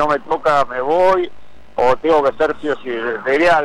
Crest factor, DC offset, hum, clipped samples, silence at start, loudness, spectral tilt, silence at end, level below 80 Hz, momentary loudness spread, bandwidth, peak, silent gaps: 12 dB; under 0.1%; none; under 0.1%; 0 s; -16 LUFS; -5 dB/octave; 0 s; -46 dBFS; 8 LU; 11.5 kHz; -4 dBFS; none